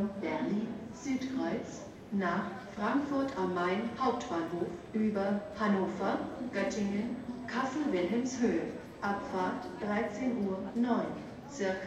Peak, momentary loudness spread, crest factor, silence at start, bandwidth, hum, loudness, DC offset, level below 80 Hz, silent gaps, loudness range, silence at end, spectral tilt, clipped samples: -18 dBFS; 7 LU; 16 dB; 0 s; 8.8 kHz; none; -34 LUFS; under 0.1%; -64 dBFS; none; 2 LU; 0 s; -6 dB/octave; under 0.1%